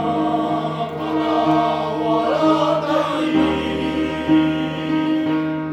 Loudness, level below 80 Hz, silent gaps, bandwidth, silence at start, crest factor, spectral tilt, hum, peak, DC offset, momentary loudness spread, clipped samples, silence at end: -19 LUFS; -46 dBFS; none; 8.6 kHz; 0 s; 14 dB; -7 dB/octave; none; -6 dBFS; under 0.1%; 5 LU; under 0.1%; 0 s